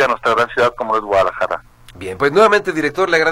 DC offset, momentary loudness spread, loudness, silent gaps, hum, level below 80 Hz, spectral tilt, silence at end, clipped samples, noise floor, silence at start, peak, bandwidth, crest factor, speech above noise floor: under 0.1%; 11 LU; -15 LUFS; none; none; -46 dBFS; -4.5 dB/octave; 0 s; under 0.1%; -35 dBFS; 0 s; 0 dBFS; 15.5 kHz; 16 dB; 21 dB